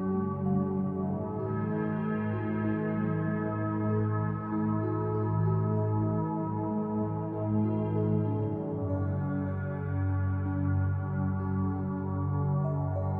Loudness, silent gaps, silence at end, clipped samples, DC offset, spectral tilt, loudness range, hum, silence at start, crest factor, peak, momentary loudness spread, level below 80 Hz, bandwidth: -31 LUFS; none; 0 s; under 0.1%; under 0.1%; -12.5 dB/octave; 1 LU; none; 0 s; 12 dB; -18 dBFS; 4 LU; -56 dBFS; 3.4 kHz